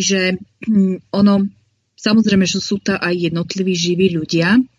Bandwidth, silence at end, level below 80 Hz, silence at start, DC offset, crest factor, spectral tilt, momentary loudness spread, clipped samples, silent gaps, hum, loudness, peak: 7.8 kHz; 0.1 s; -50 dBFS; 0 s; under 0.1%; 14 dB; -5 dB/octave; 6 LU; under 0.1%; none; none; -16 LUFS; -2 dBFS